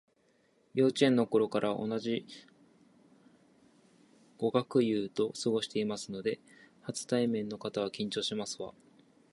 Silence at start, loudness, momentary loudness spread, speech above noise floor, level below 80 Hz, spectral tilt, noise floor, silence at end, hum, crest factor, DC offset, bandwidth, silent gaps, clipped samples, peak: 0.75 s; -32 LUFS; 13 LU; 38 dB; -76 dBFS; -5 dB/octave; -70 dBFS; 0.6 s; none; 22 dB; under 0.1%; 11.5 kHz; none; under 0.1%; -12 dBFS